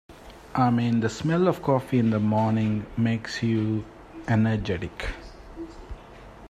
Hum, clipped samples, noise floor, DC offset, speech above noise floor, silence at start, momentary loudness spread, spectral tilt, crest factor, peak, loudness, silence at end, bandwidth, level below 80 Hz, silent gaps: none; under 0.1%; -45 dBFS; under 0.1%; 21 dB; 0.1 s; 19 LU; -7.5 dB/octave; 18 dB; -8 dBFS; -25 LUFS; 0 s; 12.5 kHz; -46 dBFS; none